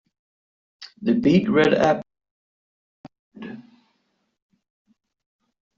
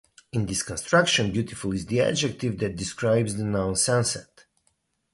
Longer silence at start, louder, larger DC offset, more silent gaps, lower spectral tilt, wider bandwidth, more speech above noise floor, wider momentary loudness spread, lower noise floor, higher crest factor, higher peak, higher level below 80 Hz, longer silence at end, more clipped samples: first, 0.8 s vs 0.35 s; first, -20 LUFS vs -25 LUFS; neither; first, 2.31-3.04 s, 3.19-3.31 s vs none; first, -5.5 dB/octave vs -4 dB/octave; second, 7.6 kHz vs 11.5 kHz; first, 53 dB vs 47 dB; first, 22 LU vs 8 LU; about the same, -72 dBFS vs -71 dBFS; about the same, 20 dB vs 18 dB; about the same, -4 dBFS vs -6 dBFS; second, -60 dBFS vs -50 dBFS; first, 2.15 s vs 0.9 s; neither